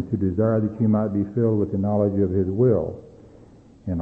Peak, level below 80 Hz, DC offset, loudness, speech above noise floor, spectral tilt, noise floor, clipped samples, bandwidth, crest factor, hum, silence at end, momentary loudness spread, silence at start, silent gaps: -8 dBFS; -50 dBFS; under 0.1%; -22 LUFS; 28 dB; -12.5 dB/octave; -49 dBFS; under 0.1%; 2.5 kHz; 14 dB; none; 0 s; 10 LU; 0 s; none